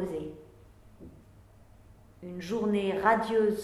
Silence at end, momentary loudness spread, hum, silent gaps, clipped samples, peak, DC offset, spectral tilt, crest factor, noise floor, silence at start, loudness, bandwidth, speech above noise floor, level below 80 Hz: 0 s; 23 LU; none; none; under 0.1%; -10 dBFS; under 0.1%; -6.5 dB/octave; 22 dB; -55 dBFS; 0 s; -29 LUFS; 13 kHz; 28 dB; -58 dBFS